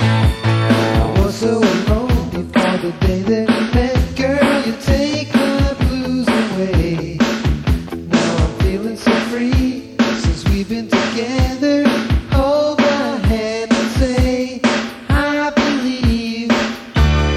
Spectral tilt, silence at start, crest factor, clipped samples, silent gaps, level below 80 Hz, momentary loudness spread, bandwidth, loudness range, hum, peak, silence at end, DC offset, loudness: -6 dB/octave; 0 s; 16 dB; under 0.1%; none; -22 dBFS; 4 LU; 14.5 kHz; 1 LU; none; 0 dBFS; 0 s; under 0.1%; -16 LUFS